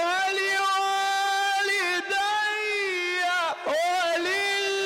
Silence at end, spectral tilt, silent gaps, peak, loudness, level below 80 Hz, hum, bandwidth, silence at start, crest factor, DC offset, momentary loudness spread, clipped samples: 0 s; 0 dB/octave; none; -18 dBFS; -24 LUFS; -74 dBFS; none; 16.5 kHz; 0 s; 8 dB; under 0.1%; 2 LU; under 0.1%